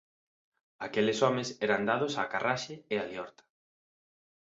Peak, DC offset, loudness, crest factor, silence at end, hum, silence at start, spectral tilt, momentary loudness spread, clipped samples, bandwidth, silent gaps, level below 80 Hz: -12 dBFS; under 0.1%; -31 LUFS; 22 dB; 1.2 s; none; 0.8 s; -4.5 dB/octave; 13 LU; under 0.1%; 7.8 kHz; none; -74 dBFS